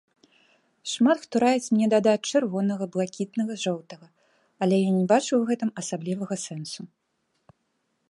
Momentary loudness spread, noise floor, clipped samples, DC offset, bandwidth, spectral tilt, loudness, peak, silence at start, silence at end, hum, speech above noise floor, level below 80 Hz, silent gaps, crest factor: 13 LU; -74 dBFS; under 0.1%; under 0.1%; 11.5 kHz; -5.5 dB/octave; -25 LUFS; -8 dBFS; 0.85 s; 1.25 s; none; 50 dB; -74 dBFS; none; 18 dB